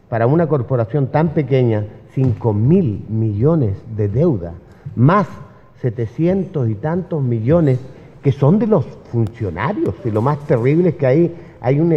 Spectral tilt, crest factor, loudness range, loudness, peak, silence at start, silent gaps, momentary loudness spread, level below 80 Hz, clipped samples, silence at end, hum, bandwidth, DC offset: -10.5 dB/octave; 16 dB; 2 LU; -17 LUFS; 0 dBFS; 0.1 s; none; 8 LU; -46 dBFS; under 0.1%; 0 s; none; 6.2 kHz; under 0.1%